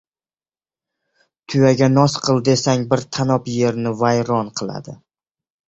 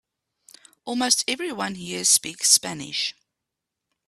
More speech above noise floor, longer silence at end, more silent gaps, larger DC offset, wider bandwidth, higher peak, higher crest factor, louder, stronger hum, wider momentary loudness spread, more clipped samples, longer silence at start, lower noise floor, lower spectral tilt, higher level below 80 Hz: first, over 73 dB vs 60 dB; second, 0.7 s vs 0.95 s; neither; neither; second, 8.2 kHz vs 15.5 kHz; about the same, -2 dBFS vs -2 dBFS; second, 18 dB vs 24 dB; first, -18 LUFS vs -21 LUFS; neither; about the same, 12 LU vs 12 LU; neither; first, 1.5 s vs 0.85 s; first, under -90 dBFS vs -84 dBFS; first, -6 dB/octave vs -0.5 dB/octave; first, -54 dBFS vs -68 dBFS